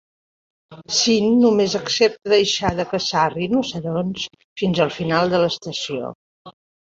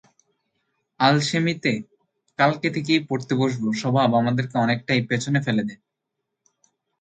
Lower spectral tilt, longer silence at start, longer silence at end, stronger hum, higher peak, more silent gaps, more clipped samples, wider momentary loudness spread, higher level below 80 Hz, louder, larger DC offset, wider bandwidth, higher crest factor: second, -4 dB/octave vs -5.5 dB/octave; second, 0.7 s vs 1 s; second, 0.35 s vs 1.25 s; neither; about the same, -2 dBFS vs -2 dBFS; first, 4.44-4.56 s, 6.15-6.45 s vs none; neither; first, 10 LU vs 6 LU; first, -50 dBFS vs -64 dBFS; first, -19 LUFS vs -22 LUFS; neither; second, 7.8 kHz vs 9.4 kHz; about the same, 18 dB vs 20 dB